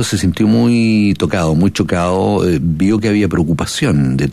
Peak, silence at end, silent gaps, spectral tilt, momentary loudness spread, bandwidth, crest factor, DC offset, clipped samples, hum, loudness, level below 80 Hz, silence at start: -2 dBFS; 0 s; none; -6 dB/octave; 4 LU; 14 kHz; 12 dB; under 0.1%; under 0.1%; none; -14 LUFS; -36 dBFS; 0 s